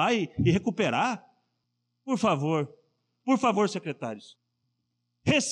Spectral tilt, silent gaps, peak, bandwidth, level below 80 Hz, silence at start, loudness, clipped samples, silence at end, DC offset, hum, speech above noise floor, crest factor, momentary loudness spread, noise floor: -5 dB/octave; none; -10 dBFS; 10.5 kHz; -58 dBFS; 0 s; -27 LUFS; under 0.1%; 0 s; under 0.1%; 60 Hz at -55 dBFS; 53 dB; 18 dB; 13 LU; -79 dBFS